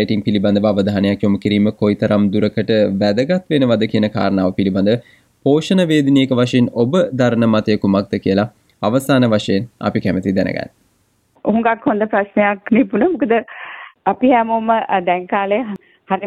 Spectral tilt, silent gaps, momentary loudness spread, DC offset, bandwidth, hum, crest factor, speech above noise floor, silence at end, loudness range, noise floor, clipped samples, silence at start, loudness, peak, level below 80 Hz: -7 dB/octave; none; 7 LU; under 0.1%; 13 kHz; none; 14 dB; 45 dB; 0 s; 3 LU; -60 dBFS; under 0.1%; 0 s; -16 LUFS; -2 dBFS; -54 dBFS